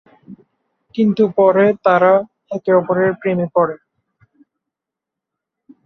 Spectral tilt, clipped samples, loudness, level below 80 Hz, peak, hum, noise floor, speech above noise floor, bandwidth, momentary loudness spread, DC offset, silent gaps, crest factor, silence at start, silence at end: -9 dB/octave; under 0.1%; -15 LUFS; -64 dBFS; 0 dBFS; none; -84 dBFS; 70 dB; 6.2 kHz; 12 LU; under 0.1%; none; 16 dB; 0.3 s; 2.1 s